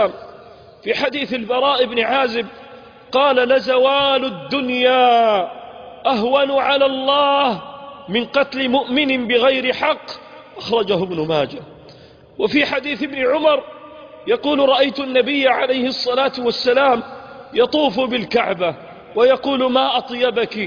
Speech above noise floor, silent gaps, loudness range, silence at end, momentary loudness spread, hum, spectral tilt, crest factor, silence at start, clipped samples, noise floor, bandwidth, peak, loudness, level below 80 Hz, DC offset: 27 dB; none; 4 LU; 0 s; 13 LU; none; -5.5 dB/octave; 14 dB; 0 s; under 0.1%; -44 dBFS; 5.2 kHz; -4 dBFS; -17 LUFS; -56 dBFS; under 0.1%